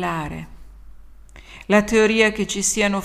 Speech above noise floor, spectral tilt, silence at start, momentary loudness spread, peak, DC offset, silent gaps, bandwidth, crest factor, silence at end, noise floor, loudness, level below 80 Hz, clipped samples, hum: 23 dB; -3.5 dB/octave; 0 s; 17 LU; -2 dBFS; under 0.1%; none; 15 kHz; 20 dB; 0 s; -42 dBFS; -18 LUFS; -42 dBFS; under 0.1%; none